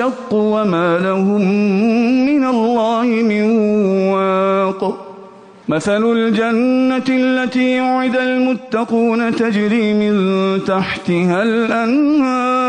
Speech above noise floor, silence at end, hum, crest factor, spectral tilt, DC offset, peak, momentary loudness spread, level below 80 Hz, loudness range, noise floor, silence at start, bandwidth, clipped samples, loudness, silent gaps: 24 dB; 0 s; none; 10 dB; -7 dB/octave; under 0.1%; -4 dBFS; 4 LU; -56 dBFS; 2 LU; -39 dBFS; 0 s; 9.8 kHz; under 0.1%; -15 LUFS; none